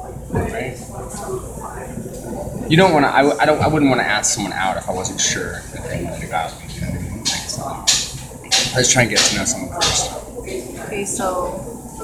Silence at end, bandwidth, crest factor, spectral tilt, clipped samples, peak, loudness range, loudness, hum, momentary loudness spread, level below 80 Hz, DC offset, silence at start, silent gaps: 0 s; 19 kHz; 20 dB; -3 dB/octave; under 0.1%; 0 dBFS; 5 LU; -18 LUFS; none; 16 LU; -38 dBFS; under 0.1%; 0 s; none